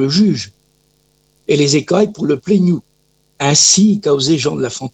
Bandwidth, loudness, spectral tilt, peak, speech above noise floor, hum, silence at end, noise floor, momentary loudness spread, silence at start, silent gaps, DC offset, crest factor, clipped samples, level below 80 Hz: 9.4 kHz; -13 LUFS; -4 dB/octave; 0 dBFS; 46 dB; 50 Hz at -35 dBFS; 0.05 s; -59 dBFS; 12 LU; 0 s; none; under 0.1%; 14 dB; under 0.1%; -54 dBFS